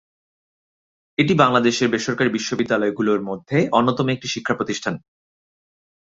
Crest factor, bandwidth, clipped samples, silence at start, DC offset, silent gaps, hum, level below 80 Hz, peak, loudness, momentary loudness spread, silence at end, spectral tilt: 22 dB; 8 kHz; under 0.1%; 1.2 s; under 0.1%; none; none; -58 dBFS; 0 dBFS; -20 LUFS; 9 LU; 1.15 s; -5 dB/octave